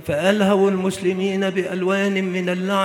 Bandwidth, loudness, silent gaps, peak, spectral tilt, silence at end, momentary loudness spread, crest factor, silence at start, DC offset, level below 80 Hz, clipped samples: 15.5 kHz; -20 LUFS; none; -4 dBFS; -6 dB/octave; 0 s; 5 LU; 16 dB; 0 s; under 0.1%; -58 dBFS; under 0.1%